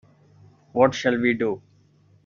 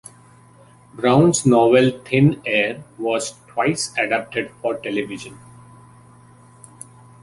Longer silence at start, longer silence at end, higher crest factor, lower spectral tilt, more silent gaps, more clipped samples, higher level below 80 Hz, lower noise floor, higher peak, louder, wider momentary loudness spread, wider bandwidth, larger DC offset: second, 0.75 s vs 0.95 s; second, 0.65 s vs 1.9 s; about the same, 22 dB vs 18 dB; about the same, -4 dB/octave vs -5 dB/octave; neither; neither; second, -62 dBFS vs -56 dBFS; first, -58 dBFS vs -49 dBFS; about the same, -2 dBFS vs -2 dBFS; second, -22 LUFS vs -19 LUFS; second, 11 LU vs 14 LU; second, 7.4 kHz vs 11.5 kHz; neither